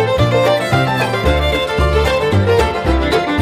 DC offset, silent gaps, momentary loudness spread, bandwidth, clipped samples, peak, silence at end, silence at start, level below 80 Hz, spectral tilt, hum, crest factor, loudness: under 0.1%; none; 2 LU; 16 kHz; under 0.1%; -2 dBFS; 0 s; 0 s; -22 dBFS; -6 dB/octave; none; 12 dB; -14 LUFS